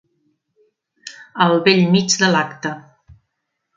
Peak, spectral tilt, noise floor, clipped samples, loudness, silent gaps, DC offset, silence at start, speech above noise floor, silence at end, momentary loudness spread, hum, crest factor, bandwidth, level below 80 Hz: 0 dBFS; -4 dB/octave; -75 dBFS; under 0.1%; -16 LUFS; none; under 0.1%; 1.05 s; 59 dB; 0.95 s; 23 LU; none; 20 dB; 9.4 kHz; -60 dBFS